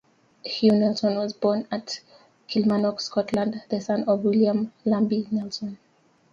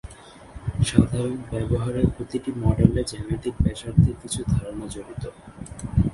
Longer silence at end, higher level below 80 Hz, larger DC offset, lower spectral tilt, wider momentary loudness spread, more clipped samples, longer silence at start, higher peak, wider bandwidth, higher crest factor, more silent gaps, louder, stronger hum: first, 0.55 s vs 0 s; second, -66 dBFS vs -34 dBFS; neither; about the same, -6.5 dB/octave vs -7 dB/octave; second, 12 LU vs 17 LU; neither; first, 0.45 s vs 0.05 s; second, -8 dBFS vs 0 dBFS; second, 7.6 kHz vs 11.5 kHz; second, 18 dB vs 24 dB; neither; about the same, -24 LUFS vs -24 LUFS; neither